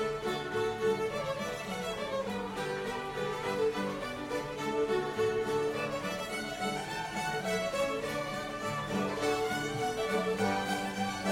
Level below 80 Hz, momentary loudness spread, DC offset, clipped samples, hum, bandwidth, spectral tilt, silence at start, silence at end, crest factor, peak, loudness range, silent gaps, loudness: -58 dBFS; 5 LU; under 0.1%; under 0.1%; none; 16 kHz; -4.5 dB/octave; 0 s; 0 s; 16 dB; -18 dBFS; 2 LU; none; -33 LUFS